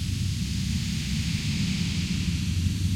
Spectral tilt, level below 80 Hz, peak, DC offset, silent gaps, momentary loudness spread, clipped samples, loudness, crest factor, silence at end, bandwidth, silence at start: -4.5 dB/octave; -38 dBFS; -12 dBFS; under 0.1%; none; 2 LU; under 0.1%; -28 LUFS; 14 dB; 0 s; 16.5 kHz; 0 s